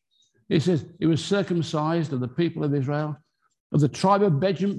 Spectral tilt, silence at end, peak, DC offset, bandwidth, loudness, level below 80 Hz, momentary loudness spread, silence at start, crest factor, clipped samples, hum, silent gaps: -7 dB/octave; 0 s; -8 dBFS; under 0.1%; 11 kHz; -24 LUFS; -60 dBFS; 7 LU; 0.5 s; 16 dB; under 0.1%; none; 3.60-3.70 s